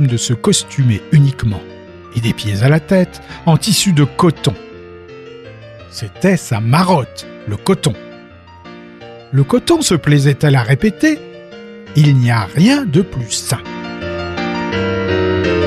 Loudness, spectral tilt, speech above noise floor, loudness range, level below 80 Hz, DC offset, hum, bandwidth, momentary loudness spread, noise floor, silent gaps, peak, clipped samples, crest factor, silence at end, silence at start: -14 LUFS; -5.5 dB/octave; 25 dB; 4 LU; -42 dBFS; under 0.1%; none; 15 kHz; 22 LU; -38 dBFS; none; 0 dBFS; under 0.1%; 14 dB; 0 s; 0 s